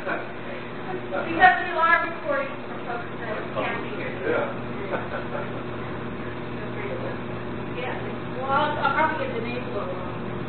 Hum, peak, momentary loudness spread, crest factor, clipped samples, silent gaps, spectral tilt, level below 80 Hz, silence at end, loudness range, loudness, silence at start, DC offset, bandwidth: none; -4 dBFS; 13 LU; 24 dB; under 0.1%; none; -10 dB/octave; -52 dBFS; 0 s; 8 LU; -26 LUFS; 0 s; 1%; 4.5 kHz